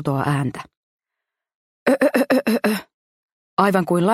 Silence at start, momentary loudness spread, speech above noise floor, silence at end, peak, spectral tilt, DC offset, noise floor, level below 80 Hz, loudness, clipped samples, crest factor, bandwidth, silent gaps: 0 s; 10 LU; 66 dB; 0 s; -2 dBFS; -6.5 dB/octave; under 0.1%; -84 dBFS; -62 dBFS; -20 LUFS; under 0.1%; 20 dB; 15.5 kHz; 0.77-0.99 s, 1.55-1.86 s, 2.94-3.57 s